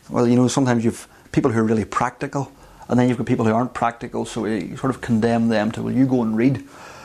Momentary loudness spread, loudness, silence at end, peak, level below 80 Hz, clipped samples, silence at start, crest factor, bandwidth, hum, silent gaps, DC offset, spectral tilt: 9 LU; -20 LUFS; 0 s; -4 dBFS; -50 dBFS; under 0.1%; 0.1 s; 16 dB; 12.5 kHz; none; none; under 0.1%; -6.5 dB/octave